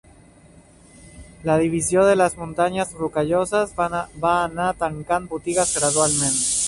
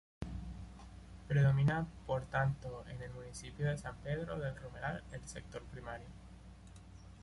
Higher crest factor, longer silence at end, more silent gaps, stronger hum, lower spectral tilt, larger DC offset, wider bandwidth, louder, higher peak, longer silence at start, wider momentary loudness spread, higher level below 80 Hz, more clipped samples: about the same, 18 dB vs 18 dB; about the same, 0 s vs 0 s; neither; neither; second, -3.5 dB/octave vs -7 dB/octave; neither; about the same, 11.5 kHz vs 11.5 kHz; first, -21 LUFS vs -39 LUFS; first, -4 dBFS vs -22 dBFS; first, 1.15 s vs 0.2 s; second, 7 LU vs 23 LU; first, -48 dBFS vs -54 dBFS; neither